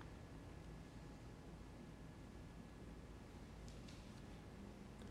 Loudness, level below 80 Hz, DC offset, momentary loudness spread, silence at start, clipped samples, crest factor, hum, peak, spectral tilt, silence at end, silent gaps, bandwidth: -58 LUFS; -62 dBFS; under 0.1%; 1 LU; 0 s; under 0.1%; 16 dB; none; -40 dBFS; -6 dB/octave; 0 s; none; 15.5 kHz